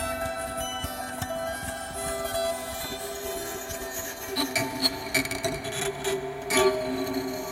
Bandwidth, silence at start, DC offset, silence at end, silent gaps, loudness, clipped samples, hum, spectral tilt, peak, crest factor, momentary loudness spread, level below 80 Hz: 16.5 kHz; 0 s; under 0.1%; 0 s; none; -29 LUFS; under 0.1%; none; -2.5 dB/octave; -8 dBFS; 22 dB; 9 LU; -50 dBFS